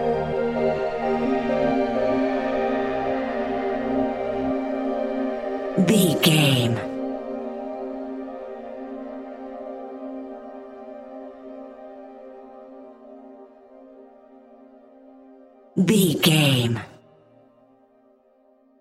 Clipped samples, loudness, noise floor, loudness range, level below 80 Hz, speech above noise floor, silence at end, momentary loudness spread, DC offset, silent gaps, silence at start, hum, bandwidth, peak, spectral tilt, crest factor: under 0.1%; -23 LUFS; -59 dBFS; 19 LU; -52 dBFS; 40 dB; 1.85 s; 24 LU; under 0.1%; none; 0 s; none; 16 kHz; -4 dBFS; -5 dB/octave; 22 dB